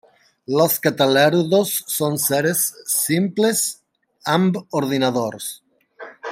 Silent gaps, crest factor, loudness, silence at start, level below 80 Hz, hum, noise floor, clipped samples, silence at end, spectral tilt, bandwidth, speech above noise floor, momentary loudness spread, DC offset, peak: none; 18 dB; -19 LUFS; 0.5 s; -66 dBFS; none; -41 dBFS; under 0.1%; 0 s; -4 dB/octave; 16.5 kHz; 22 dB; 10 LU; under 0.1%; -2 dBFS